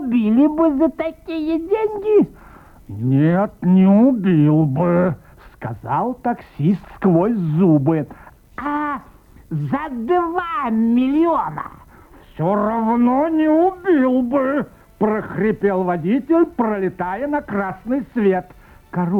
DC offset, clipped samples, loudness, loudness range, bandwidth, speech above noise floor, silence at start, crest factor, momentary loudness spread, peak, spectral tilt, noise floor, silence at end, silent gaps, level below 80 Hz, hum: under 0.1%; under 0.1%; -18 LUFS; 4 LU; 4.6 kHz; 28 dB; 0 s; 14 dB; 11 LU; -4 dBFS; -10 dB/octave; -45 dBFS; 0 s; none; -48 dBFS; none